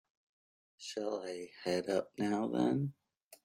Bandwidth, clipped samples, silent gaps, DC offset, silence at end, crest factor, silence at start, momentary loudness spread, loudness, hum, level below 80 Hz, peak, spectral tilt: 16 kHz; under 0.1%; 3.23-3.31 s; under 0.1%; 0.1 s; 20 dB; 0.8 s; 10 LU; -37 LUFS; none; -78 dBFS; -18 dBFS; -6 dB/octave